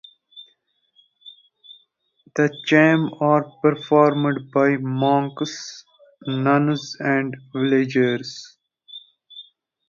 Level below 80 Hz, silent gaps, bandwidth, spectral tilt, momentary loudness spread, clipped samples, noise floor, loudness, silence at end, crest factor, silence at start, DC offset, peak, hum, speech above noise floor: -68 dBFS; none; 7.4 kHz; -6.5 dB/octave; 24 LU; under 0.1%; -65 dBFS; -20 LUFS; 0.45 s; 20 dB; 0.35 s; under 0.1%; -2 dBFS; none; 45 dB